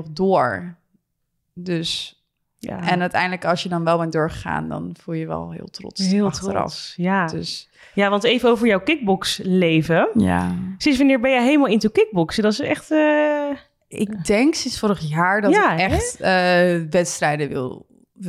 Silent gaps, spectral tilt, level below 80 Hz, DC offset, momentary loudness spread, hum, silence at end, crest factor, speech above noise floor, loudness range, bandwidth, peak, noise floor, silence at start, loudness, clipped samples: none; -5 dB/octave; -46 dBFS; under 0.1%; 13 LU; none; 0 s; 14 dB; 54 dB; 6 LU; 14.5 kHz; -6 dBFS; -74 dBFS; 0 s; -19 LUFS; under 0.1%